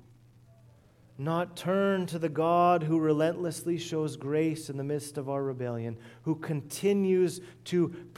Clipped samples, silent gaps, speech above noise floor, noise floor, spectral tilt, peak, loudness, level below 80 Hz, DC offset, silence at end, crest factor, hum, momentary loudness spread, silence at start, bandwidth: under 0.1%; none; 29 dB; -58 dBFS; -6.5 dB/octave; -14 dBFS; -30 LUFS; -72 dBFS; under 0.1%; 0.05 s; 16 dB; none; 10 LU; 1.15 s; 16 kHz